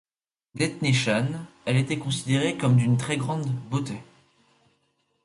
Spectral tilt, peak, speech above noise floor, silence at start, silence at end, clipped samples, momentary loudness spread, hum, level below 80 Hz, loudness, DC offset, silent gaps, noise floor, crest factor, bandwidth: -5.5 dB/octave; -10 dBFS; 47 dB; 0.55 s; 1.2 s; under 0.1%; 10 LU; none; -60 dBFS; -25 LUFS; under 0.1%; none; -71 dBFS; 16 dB; 11.5 kHz